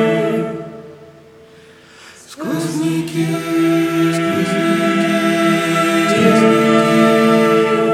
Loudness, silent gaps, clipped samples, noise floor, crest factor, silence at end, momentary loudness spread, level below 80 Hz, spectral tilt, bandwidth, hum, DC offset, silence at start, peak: -14 LUFS; none; under 0.1%; -43 dBFS; 14 dB; 0 s; 9 LU; -58 dBFS; -5.5 dB/octave; 16 kHz; none; under 0.1%; 0 s; 0 dBFS